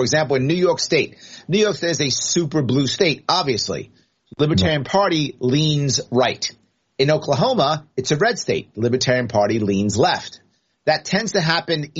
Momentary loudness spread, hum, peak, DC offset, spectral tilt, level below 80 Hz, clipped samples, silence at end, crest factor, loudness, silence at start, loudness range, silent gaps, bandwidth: 6 LU; none; 0 dBFS; under 0.1%; -4 dB/octave; -54 dBFS; under 0.1%; 0 s; 20 dB; -19 LUFS; 0 s; 1 LU; none; 8 kHz